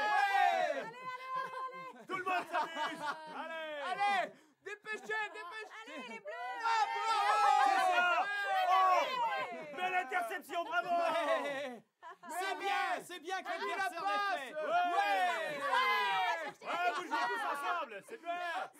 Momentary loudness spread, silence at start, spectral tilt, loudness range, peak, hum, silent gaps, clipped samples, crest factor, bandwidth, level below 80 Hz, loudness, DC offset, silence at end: 15 LU; 0 s; -1.5 dB/octave; 8 LU; -16 dBFS; none; none; under 0.1%; 18 dB; 16 kHz; under -90 dBFS; -34 LUFS; under 0.1%; 0.1 s